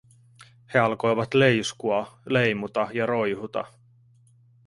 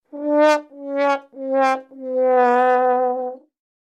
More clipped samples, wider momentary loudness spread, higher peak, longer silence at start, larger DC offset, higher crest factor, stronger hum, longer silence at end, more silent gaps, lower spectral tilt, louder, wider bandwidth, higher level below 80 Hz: neither; about the same, 10 LU vs 11 LU; about the same, -6 dBFS vs -4 dBFS; first, 0.4 s vs 0.15 s; neither; first, 20 dB vs 14 dB; neither; first, 1 s vs 0.5 s; neither; first, -5.5 dB/octave vs -3 dB/octave; second, -24 LUFS vs -19 LUFS; first, 11.5 kHz vs 9.8 kHz; first, -62 dBFS vs under -90 dBFS